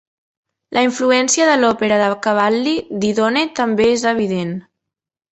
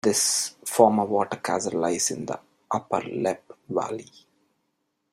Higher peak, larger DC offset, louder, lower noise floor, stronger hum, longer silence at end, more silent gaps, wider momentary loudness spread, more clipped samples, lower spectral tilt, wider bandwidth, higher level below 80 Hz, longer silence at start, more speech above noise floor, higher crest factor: about the same, -2 dBFS vs -2 dBFS; neither; first, -16 LUFS vs -25 LUFS; first, -83 dBFS vs -76 dBFS; neither; second, 0.7 s vs 1.1 s; neither; second, 7 LU vs 14 LU; neither; about the same, -3.5 dB/octave vs -3 dB/octave; second, 8.4 kHz vs 16 kHz; first, -54 dBFS vs -68 dBFS; first, 0.7 s vs 0.05 s; first, 68 dB vs 51 dB; second, 16 dB vs 24 dB